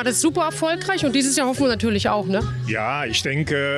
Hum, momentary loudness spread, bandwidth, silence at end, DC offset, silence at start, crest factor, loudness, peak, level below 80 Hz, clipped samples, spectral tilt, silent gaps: none; 5 LU; 13.5 kHz; 0 s; under 0.1%; 0 s; 12 dB; -21 LUFS; -10 dBFS; -46 dBFS; under 0.1%; -4 dB/octave; none